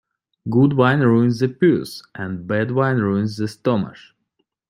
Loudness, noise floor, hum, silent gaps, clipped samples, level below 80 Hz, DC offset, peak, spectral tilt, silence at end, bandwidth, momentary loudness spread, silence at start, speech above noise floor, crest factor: -19 LUFS; -72 dBFS; none; none; under 0.1%; -58 dBFS; under 0.1%; -2 dBFS; -8 dB/octave; 0.75 s; 15 kHz; 14 LU; 0.45 s; 54 dB; 18 dB